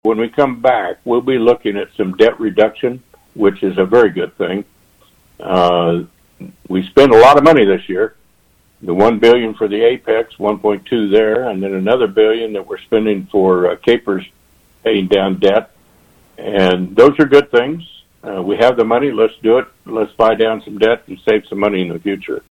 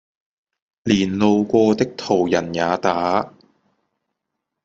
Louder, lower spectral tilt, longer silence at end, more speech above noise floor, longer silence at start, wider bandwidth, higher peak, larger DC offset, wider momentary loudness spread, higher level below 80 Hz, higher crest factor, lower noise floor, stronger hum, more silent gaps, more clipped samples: first, -14 LUFS vs -19 LUFS; about the same, -6.5 dB/octave vs -6 dB/octave; second, 0.15 s vs 1.35 s; second, 41 dB vs 62 dB; second, 0.05 s vs 0.85 s; first, 10.5 kHz vs 7.8 kHz; about the same, 0 dBFS vs -2 dBFS; neither; first, 12 LU vs 6 LU; first, -50 dBFS vs -58 dBFS; about the same, 14 dB vs 18 dB; second, -54 dBFS vs -80 dBFS; neither; neither; neither